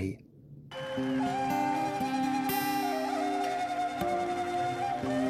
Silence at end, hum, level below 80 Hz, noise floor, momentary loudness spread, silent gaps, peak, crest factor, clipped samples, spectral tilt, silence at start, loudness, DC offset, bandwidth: 0 s; none; -64 dBFS; -51 dBFS; 6 LU; none; -16 dBFS; 14 dB; under 0.1%; -5 dB/octave; 0 s; -31 LUFS; under 0.1%; 15.5 kHz